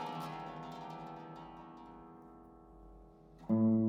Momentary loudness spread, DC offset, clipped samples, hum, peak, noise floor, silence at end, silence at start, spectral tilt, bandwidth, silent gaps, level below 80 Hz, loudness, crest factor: 23 LU; under 0.1%; under 0.1%; none; -22 dBFS; -58 dBFS; 0 s; 0 s; -8.5 dB/octave; 7.4 kHz; none; -66 dBFS; -40 LUFS; 16 dB